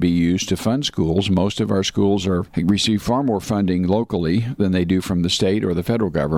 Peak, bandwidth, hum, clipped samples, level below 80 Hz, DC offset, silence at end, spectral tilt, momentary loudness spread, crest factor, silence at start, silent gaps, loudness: -6 dBFS; 15.5 kHz; none; under 0.1%; -42 dBFS; under 0.1%; 0 s; -6 dB/octave; 3 LU; 12 dB; 0 s; none; -19 LUFS